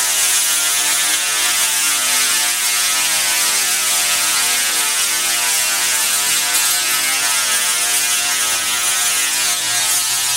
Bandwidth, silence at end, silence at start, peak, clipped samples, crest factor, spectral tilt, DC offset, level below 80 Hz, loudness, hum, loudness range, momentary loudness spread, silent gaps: 16 kHz; 0 s; 0 s; -2 dBFS; under 0.1%; 14 dB; 2.5 dB/octave; 0.1%; -58 dBFS; -13 LUFS; none; 1 LU; 1 LU; none